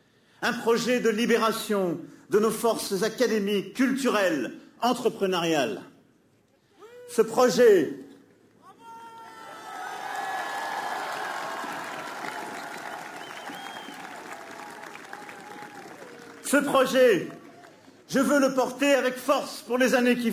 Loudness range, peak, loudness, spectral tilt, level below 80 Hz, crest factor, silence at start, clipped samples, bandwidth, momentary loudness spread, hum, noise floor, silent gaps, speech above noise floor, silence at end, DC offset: 13 LU; -8 dBFS; -25 LUFS; -4 dB/octave; -72 dBFS; 18 dB; 0.4 s; under 0.1%; 16 kHz; 20 LU; none; -64 dBFS; none; 40 dB; 0 s; under 0.1%